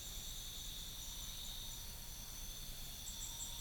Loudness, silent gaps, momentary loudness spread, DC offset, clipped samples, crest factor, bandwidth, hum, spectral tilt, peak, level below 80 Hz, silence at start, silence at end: -47 LUFS; none; 3 LU; under 0.1%; under 0.1%; 16 dB; over 20 kHz; none; -1 dB/octave; -32 dBFS; -52 dBFS; 0 s; 0 s